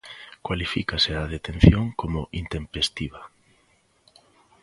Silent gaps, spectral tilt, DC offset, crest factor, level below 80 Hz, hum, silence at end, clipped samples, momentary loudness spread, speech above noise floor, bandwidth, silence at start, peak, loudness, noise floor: none; -6 dB/octave; under 0.1%; 24 dB; -34 dBFS; none; 1.35 s; under 0.1%; 17 LU; 40 dB; 11.5 kHz; 0.05 s; 0 dBFS; -24 LUFS; -63 dBFS